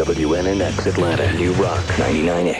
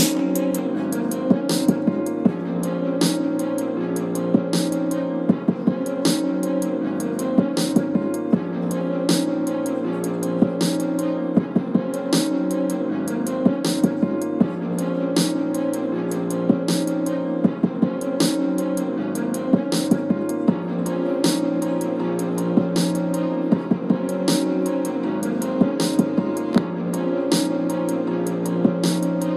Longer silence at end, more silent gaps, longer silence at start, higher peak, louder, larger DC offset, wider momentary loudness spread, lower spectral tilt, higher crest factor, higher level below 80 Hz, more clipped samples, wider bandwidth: about the same, 0 s vs 0 s; neither; about the same, 0 s vs 0 s; about the same, -6 dBFS vs -4 dBFS; first, -18 LUFS vs -22 LUFS; first, 0.2% vs under 0.1%; about the same, 2 LU vs 4 LU; about the same, -6 dB/octave vs -6 dB/octave; about the same, 12 dB vs 16 dB; first, -34 dBFS vs -64 dBFS; neither; second, 12 kHz vs 15 kHz